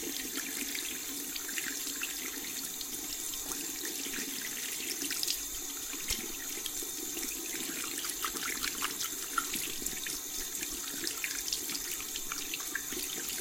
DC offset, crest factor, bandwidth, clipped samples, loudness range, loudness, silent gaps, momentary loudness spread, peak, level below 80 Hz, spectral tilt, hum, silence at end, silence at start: under 0.1%; 24 dB; 17 kHz; under 0.1%; 1 LU; -34 LUFS; none; 3 LU; -12 dBFS; -58 dBFS; 0 dB/octave; none; 0 s; 0 s